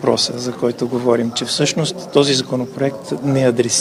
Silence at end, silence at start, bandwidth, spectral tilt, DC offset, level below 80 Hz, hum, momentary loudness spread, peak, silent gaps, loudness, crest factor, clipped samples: 0 s; 0 s; 16 kHz; -4 dB/octave; under 0.1%; -60 dBFS; none; 7 LU; 0 dBFS; none; -18 LUFS; 18 dB; under 0.1%